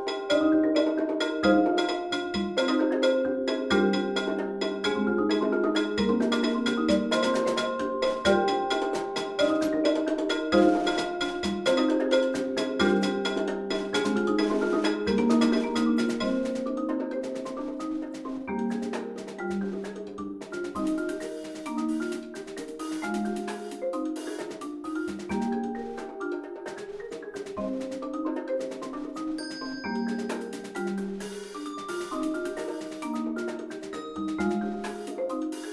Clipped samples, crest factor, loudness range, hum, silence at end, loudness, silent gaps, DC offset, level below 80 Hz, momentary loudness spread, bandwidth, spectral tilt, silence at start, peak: under 0.1%; 18 dB; 8 LU; none; 0 s; -28 LUFS; none; under 0.1%; -58 dBFS; 12 LU; 12 kHz; -5 dB/octave; 0 s; -8 dBFS